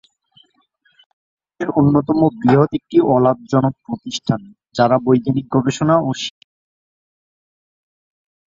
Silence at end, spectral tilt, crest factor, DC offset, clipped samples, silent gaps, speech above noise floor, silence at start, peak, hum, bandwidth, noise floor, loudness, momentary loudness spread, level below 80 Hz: 2.2 s; -7 dB/octave; 18 dB; under 0.1%; under 0.1%; none; 45 dB; 1.6 s; -2 dBFS; none; 7.8 kHz; -61 dBFS; -17 LUFS; 11 LU; -54 dBFS